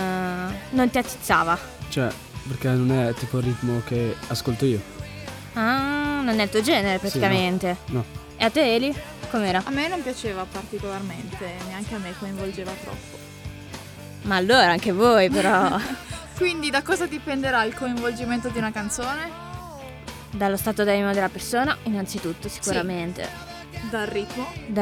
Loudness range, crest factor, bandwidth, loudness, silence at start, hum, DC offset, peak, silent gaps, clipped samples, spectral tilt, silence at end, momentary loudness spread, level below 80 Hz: 8 LU; 20 dB; 19.5 kHz; -24 LUFS; 0 s; none; under 0.1%; -4 dBFS; none; under 0.1%; -5 dB/octave; 0 s; 16 LU; -46 dBFS